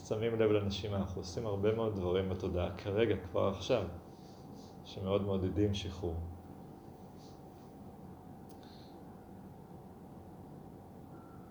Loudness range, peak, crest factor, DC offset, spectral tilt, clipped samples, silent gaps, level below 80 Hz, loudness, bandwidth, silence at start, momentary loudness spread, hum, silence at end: 18 LU; -18 dBFS; 20 dB; under 0.1%; -7 dB/octave; under 0.1%; none; -56 dBFS; -35 LUFS; over 20 kHz; 0 s; 20 LU; none; 0 s